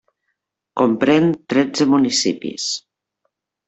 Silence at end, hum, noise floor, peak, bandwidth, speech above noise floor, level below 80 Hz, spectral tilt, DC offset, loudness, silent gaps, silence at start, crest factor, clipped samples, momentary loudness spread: 0.9 s; none; -75 dBFS; -4 dBFS; 8.2 kHz; 58 dB; -60 dBFS; -4 dB/octave; under 0.1%; -18 LUFS; none; 0.75 s; 16 dB; under 0.1%; 9 LU